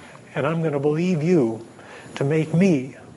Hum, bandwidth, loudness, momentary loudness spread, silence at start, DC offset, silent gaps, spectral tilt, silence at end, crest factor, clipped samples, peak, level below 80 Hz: none; 11.5 kHz; -22 LUFS; 17 LU; 0 s; under 0.1%; none; -8 dB/octave; 0.05 s; 14 dB; under 0.1%; -8 dBFS; -66 dBFS